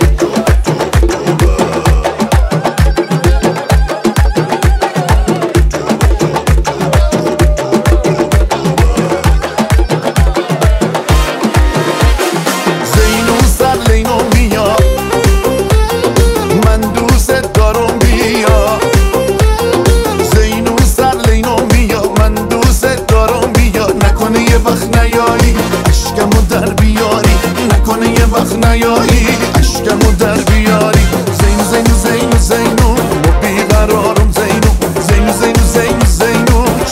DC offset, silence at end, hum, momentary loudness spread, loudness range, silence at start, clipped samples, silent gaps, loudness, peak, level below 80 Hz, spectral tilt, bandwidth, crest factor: under 0.1%; 0 s; none; 3 LU; 2 LU; 0 s; under 0.1%; none; -10 LUFS; 0 dBFS; -14 dBFS; -5.5 dB/octave; 16.5 kHz; 10 dB